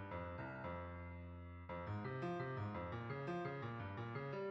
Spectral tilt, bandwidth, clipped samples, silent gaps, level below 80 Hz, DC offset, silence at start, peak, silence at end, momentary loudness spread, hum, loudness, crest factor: -6.5 dB/octave; 7.6 kHz; under 0.1%; none; -66 dBFS; under 0.1%; 0 s; -32 dBFS; 0 s; 7 LU; none; -47 LUFS; 14 dB